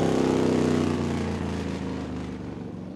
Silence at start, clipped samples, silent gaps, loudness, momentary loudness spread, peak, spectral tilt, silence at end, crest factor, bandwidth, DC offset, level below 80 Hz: 0 s; under 0.1%; none; -27 LUFS; 12 LU; -12 dBFS; -6.5 dB/octave; 0 s; 14 dB; 12.5 kHz; under 0.1%; -46 dBFS